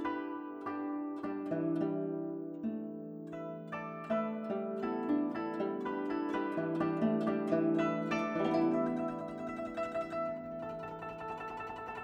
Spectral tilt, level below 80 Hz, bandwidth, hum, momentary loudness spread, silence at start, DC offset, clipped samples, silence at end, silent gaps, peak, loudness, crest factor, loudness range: -8 dB/octave; -70 dBFS; 8.6 kHz; none; 10 LU; 0 s; under 0.1%; under 0.1%; 0 s; none; -18 dBFS; -36 LUFS; 18 dB; 5 LU